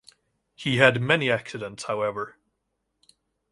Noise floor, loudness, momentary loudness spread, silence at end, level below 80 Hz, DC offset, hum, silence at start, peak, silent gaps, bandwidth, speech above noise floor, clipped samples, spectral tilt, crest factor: -78 dBFS; -24 LUFS; 16 LU; 1.25 s; -62 dBFS; under 0.1%; none; 0.6 s; -2 dBFS; none; 11.5 kHz; 54 dB; under 0.1%; -5 dB/octave; 26 dB